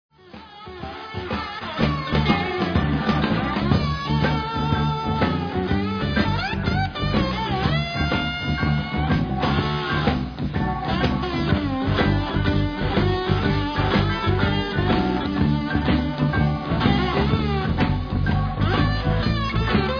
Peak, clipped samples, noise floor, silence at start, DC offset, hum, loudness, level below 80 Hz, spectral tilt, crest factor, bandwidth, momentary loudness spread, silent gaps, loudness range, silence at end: -4 dBFS; under 0.1%; -43 dBFS; 0.35 s; under 0.1%; none; -22 LUFS; -32 dBFS; -7.5 dB/octave; 18 dB; 5.4 kHz; 3 LU; none; 1 LU; 0 s